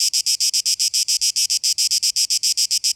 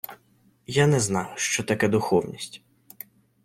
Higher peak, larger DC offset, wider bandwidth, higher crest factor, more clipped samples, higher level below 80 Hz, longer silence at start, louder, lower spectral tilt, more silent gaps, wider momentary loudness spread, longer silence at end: about the same, -6 dBFS vs -6 dBFS; neither; first, over 20 kHz vs 16.5 kHz; second, 14 dB vs 20 dB; neither; second, -68 dBFS vs -60 dBFS; about the same, 0 s vs 0.1 s; first, -16 LUFS vs -24 LUFS; second, 6.5 dB/octave vs -4.5 dB/octave; neither; second, 1 LU vs 22 LU; second, 0.05 s vs 0.85 s